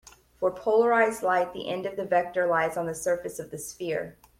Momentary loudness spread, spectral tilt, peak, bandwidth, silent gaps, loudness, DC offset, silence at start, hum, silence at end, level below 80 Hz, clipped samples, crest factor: 11 LU; -4 dB/octave; -10 dBFS; 16 kHz; none; -27 LUFS; under 0.1%; 0.05 s; none; 0.3 s; -62 dBFS; under 0.1%; 18 dB